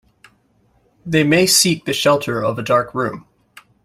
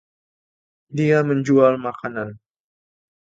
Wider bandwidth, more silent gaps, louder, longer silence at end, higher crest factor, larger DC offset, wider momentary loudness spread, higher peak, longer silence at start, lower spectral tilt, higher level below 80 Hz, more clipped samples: first, 16 kHz vs 7.8 kHz; neither; first, -16 LUFS vs -19 LUFS; second, 0.65 s vs 0.9 s; about the same, 18 dB vs 20 dB; neither; second, 12 LU vs 15 LU; about the same, 0 dBFS vs -2 dBFS; first, 1.05 s vs 0.9 s; second, -3.5 dB/octave vs -8 dB/octave; first, -54 dBFS vs -64 dBFS; neither